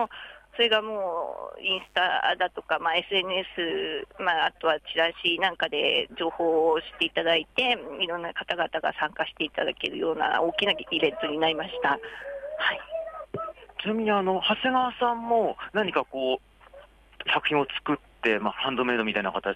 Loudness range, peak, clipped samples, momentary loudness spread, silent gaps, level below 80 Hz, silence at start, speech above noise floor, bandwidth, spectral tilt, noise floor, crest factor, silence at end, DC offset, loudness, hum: 3 LU; -10 dBFS; under 0.1%; 9 LU; none; -60 dBFS; 0 s; 25 dB; 10 kHz; -5 dB/octave; -52 dBFS; 16 dB; 0 s; under 0.1%; -26 LUFS; none